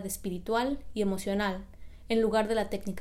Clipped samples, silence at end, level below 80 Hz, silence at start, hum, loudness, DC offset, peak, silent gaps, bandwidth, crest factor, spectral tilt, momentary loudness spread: under 0.1%; 0 s; -50 dBFS; 0 s; none; -30 LUFS; under 0.1%; -14 dBFS; none; 16 kHz; 16 dB; -5 dB/octave; 8 LU